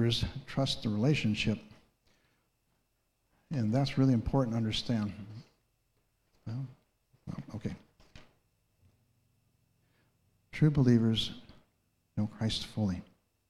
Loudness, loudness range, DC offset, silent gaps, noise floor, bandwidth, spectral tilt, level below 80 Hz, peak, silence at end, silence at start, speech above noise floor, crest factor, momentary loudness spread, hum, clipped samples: -32 LUFS; 15 LU; under 0.1%; none; -77 dBFS; 12.5 kHz; -6.5 dB/octave; -54 dBFS; -14 dBFS; 0.45 s; 0 s; 47 dB; 20 dB; 19 LU; none; under 0.1%